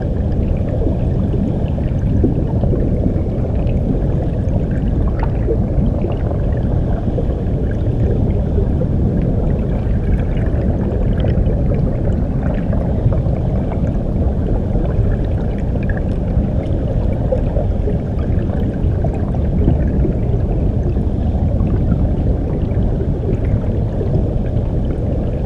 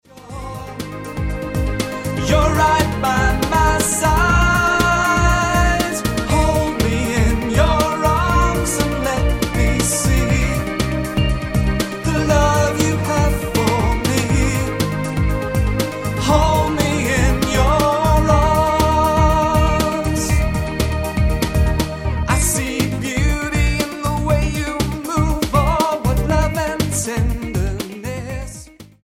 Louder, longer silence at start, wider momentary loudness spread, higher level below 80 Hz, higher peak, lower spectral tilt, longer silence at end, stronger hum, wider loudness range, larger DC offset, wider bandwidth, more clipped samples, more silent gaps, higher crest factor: about the same, -18 LUFS vs -17 LUFS; second, 0 s vs 0.15 s; second, 3 LU vs 7 LU; about the same, -20 dBFS vs -22 dBFS; about the same, -2 dBFS vs 0 dBFS; first, -10.5 dB/octave vs -5 dB/octave; second, 0 s vs 0.2 s; neither; about the same, 1 LU vs 3 LU; neither; second, 5.2 kHz vs 17 kHz; neither; neither; about the same, 14 dB vs 16 dB